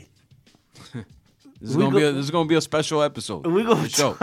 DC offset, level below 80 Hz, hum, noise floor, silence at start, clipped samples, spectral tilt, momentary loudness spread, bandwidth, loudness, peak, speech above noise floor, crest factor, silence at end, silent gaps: under 0.1%; -60 dBFS; none; -56 dBFS; 0.75 s; under 0.1%; -4.5 dB/octave; 20 LU; 16.5 kHz; -21 LUFS; -4 dBFS; 35 dB; 20 dB; 0 s; none